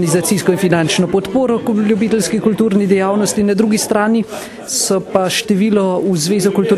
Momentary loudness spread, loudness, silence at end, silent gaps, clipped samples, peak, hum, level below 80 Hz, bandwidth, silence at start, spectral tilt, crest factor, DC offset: 2 LU; -14 LUFS; 0 s; none; under 0.1%; 0 dBFS; none; -50 dBFS; 13.5 kHz; 0 s; -5 dB/octave; 14 dB; under 0.1%